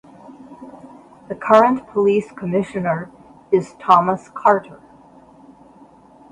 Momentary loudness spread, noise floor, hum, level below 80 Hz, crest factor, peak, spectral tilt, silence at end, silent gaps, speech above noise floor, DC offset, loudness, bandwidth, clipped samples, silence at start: 25 LU; -47 dBFS; none; -60 dBFS; 20 dB; 0 dBFS; -7 dB/octave; 1.55 s; none; 30 dB; under 0.1%; -18 LUFS; 10.5 kHz; under 0.1%; 0.3 s